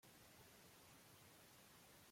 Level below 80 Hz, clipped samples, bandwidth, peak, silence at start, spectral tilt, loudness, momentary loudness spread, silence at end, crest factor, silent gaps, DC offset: -86 dBFS; under 0.1%; 16.5 kHz; -54 dBFS; 0 s; -3 dB/octave; -65 LUFS; 0 LU; 0 s; 12 dB; none; under 0.1%